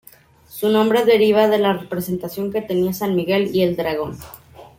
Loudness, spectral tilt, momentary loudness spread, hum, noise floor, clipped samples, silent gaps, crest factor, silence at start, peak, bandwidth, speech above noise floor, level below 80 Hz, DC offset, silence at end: -18 LUFS; -6 dB/octave; 12 LU; none; -48 dBFS; under 0.1%; none; 16 dB; 0.5 s; -4 dBFS; 16.5 kHz; 30 dB; -54 dBFS; under 0.1%; 0.15 s